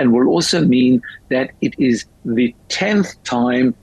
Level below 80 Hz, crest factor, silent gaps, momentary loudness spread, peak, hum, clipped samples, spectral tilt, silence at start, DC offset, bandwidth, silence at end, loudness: -52 dBFS; 10 dB; none; 8 LU; -6 dBFS; none; under 0.1%; -5 dB/octave; 0 s; under 0.1%; 12 kHz; 0.1 s; -17 LUFS